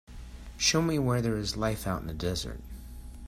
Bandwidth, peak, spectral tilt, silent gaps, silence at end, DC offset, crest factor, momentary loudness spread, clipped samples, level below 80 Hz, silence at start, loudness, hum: 16 kHz; -12 dBFS; -4 dB/octave; none; 0 s; under 0.1%; 20 dB; 21 LU; under 0.1%; -44 dBFS; 0.1 s; -29 LUFS; none